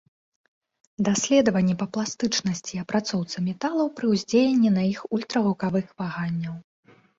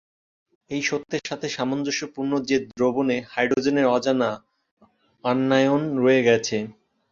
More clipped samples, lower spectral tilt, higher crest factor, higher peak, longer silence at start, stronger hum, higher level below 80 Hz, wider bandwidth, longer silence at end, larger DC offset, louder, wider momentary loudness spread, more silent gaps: neither; about the same, -5 dB/octave vs -5 dB/octave; about the same, 16 dB vs 20 dB; second, -8 dBFS vs -4 dBFS; first, 1 s vs 0.7 s; neither; about the same, -62 dBFS vs -64 dBFS; about the same, 7.8 kHz vs 7.6 kHz; first, 0.6 s vs 0.4 s; neither; about the same, -24 LUFS vs -23 LUFS; about the same, 9 LU vs 10 LU; second, none vs 4.71-4.77 s